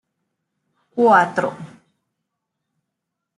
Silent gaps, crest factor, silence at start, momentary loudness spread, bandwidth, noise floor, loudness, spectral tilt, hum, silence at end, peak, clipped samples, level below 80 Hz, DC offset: none; 20 dB; 0.95 s; 18 LU; 11.5 kHz; -80 dBFS; -17 LUFS; -6 dB/octave; none; 1.7 s; -2 dBFS; under 0.1%; -76 dBFS; under 0.1%